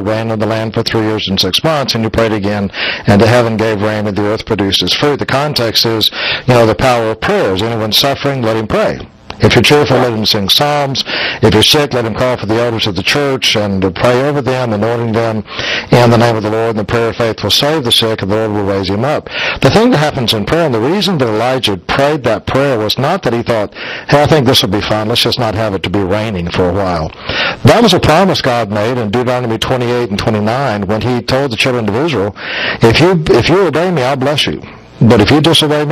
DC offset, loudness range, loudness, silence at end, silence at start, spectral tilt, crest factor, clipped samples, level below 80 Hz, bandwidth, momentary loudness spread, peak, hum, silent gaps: under 0.1%; 2 LU; -11 LUFS; 0 s; 0 s; -5 dB/octave; 12 dB; 0.3%; -36 dBFS; 16 kHz; 7 LU; 0 dBFS; none; none